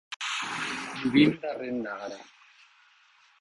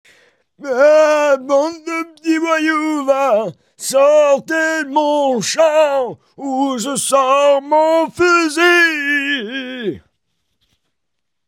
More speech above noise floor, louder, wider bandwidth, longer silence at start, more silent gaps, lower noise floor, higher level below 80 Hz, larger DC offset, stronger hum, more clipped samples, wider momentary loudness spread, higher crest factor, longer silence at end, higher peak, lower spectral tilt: second, 35 dB vs 64 dB; second, -28 LUFS vs -14 LUFS; second, 11.5 kHz vs 16.5 kHz; second, 0.1 s vs 0.6 s; first, 0.16-0.20 s vs none; second, -61 dBFS vs -78 dBFS; about the same, -66 dBFS vs -62 dBFS; neither; neither; neither; first, 16 LU vs 13 LU; first, 22 dB vs 14 dB; second, 1.15 s vs 1.5 s; second, -8 dBFS vs 0 dBFS; first, -4.5 dB/octave vs -3 dB/octave